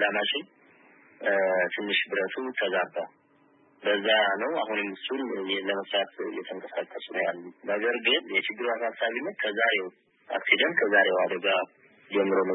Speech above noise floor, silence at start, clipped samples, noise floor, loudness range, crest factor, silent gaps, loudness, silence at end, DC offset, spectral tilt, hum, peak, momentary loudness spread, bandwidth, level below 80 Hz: 35 dB; 0 s; under 0.1%; -62 dBFS; 4 LU; 22 dB; none; -27 LUFS; 0 s; under 0.1%; -7.5 dB/octave; none; -6 dBFS; 12 LU; 4.1 kHz; under -90 dBFS